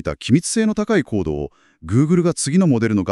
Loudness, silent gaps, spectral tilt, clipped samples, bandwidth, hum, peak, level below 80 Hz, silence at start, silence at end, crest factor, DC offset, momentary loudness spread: -18 LUFS; none; -6 dB/octave; under 0.1%; 12 kHz; none; -2 dBFS; -42 dBFS; 0.05 s; 0 s; 14 dB; under 0.1%; 8 LU